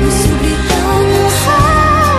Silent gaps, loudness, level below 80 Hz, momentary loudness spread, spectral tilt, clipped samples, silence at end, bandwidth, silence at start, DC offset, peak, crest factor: none; -11 LUFS; -20 dBFS; 4 LU; -4.5 dB/octave; under 0.1%; 0 s; 13.5 kHz; 0 s; under 0.1%; 0 dBFS; 10 dB